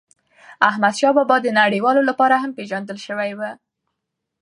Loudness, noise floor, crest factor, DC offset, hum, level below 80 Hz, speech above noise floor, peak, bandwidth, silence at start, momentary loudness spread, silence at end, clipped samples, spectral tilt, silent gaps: -18 LUFS; -79 dBFS; 20 dB; under 0.1%; none; -74 dBFS; 61 dB; 0 dBFS; 11 kHz; 0.5 s; 12 LU; 0.9 s; under 0.1%; -4.5 dB/octave; none